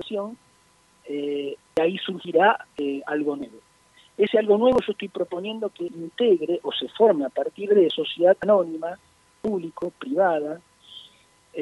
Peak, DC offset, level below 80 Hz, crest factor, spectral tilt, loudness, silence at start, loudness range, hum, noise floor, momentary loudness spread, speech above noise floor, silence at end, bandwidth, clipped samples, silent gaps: -6 dBFS; under 0.1%; -64 dBFS; 18 dB; -6 dB/octave; -23 LUFS; 0 s; 4 LU; none; -59 dBFS; 15 LU; 37 dB; 0 s; 11.5 kHz; under 0.1%; none